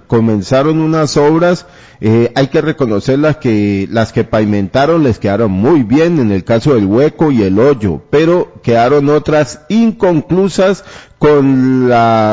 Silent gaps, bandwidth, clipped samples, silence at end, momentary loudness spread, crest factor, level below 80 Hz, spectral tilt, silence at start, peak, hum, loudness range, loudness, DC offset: none; 7.8 kHz; under 0.1%; 0 s; 4 LU; 10 dB; -38 dBFS; -7 dB/octave; 0.1 s; 0 dBFS; none; 2 LU; -11 LUFS; under 0.1%